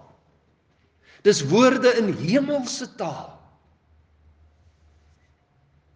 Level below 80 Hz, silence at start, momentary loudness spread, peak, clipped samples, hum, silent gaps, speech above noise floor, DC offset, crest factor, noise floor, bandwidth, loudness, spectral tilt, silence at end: -64 dBFS; 1.25 s; 15 LU; -4 dBFS; under 0.1%; none; none; 43 dB; under 0.1%; 20 dB; -63 dBFS; 10 kHz; -21 LUFS; -4.5 dB/octave; 2.65 s